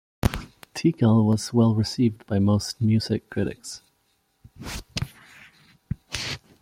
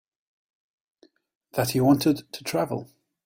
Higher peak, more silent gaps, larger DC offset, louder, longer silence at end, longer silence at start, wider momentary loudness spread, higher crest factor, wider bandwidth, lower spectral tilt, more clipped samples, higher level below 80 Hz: about the same, -4 dBFS vs -6 dBFS; neither; neither; about the same, -24 LUFS vs -25 LUFS; second, 0.25 s vs 0.4 s; second, 0.25 s vs 1.55 s; first, 17 LU vs 11 LU; about the same, 20 dB vs 20 dB; about the same, 15.5 kHz vs 16.5 kHz; about the same, -6.5 dB/octave vs -5.5 dB/octave; neither; first, -44 dBFS vs -62 dBFS